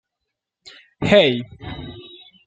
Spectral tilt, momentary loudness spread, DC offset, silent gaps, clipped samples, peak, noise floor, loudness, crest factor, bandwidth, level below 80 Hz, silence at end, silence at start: -6 dB/octave; 22 LU; under 0.1%; none; under 0.1%; -2 dBFS; -81 dBFS; -17 LUFS; 22 dB; 8.4 kHz; -48 dBFS; 0.45 s; 1 s